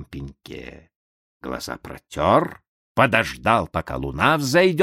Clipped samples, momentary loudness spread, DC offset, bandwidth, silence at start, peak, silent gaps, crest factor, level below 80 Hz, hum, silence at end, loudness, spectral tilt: under 0.1%; 20 LU; under 0.1%; 16 kHz; 0 s; -2 dBFS; 0.96-1.40 s, 2.68-2.95 s; 22 dB; -44 dBFS; none; 0 s; -20 LUFS; -5 dB/octave